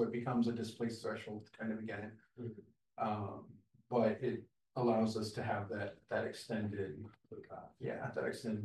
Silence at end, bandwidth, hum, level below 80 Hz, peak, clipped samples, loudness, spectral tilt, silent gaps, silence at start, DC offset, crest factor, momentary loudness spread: 0 s; 12 kHz; none; -78 dBFS; -20 dBFS; under 0.1%; -40 LUFS; -6.5 dB/octave; none; 0 s; under 0.1%; 20 dB; 17 LU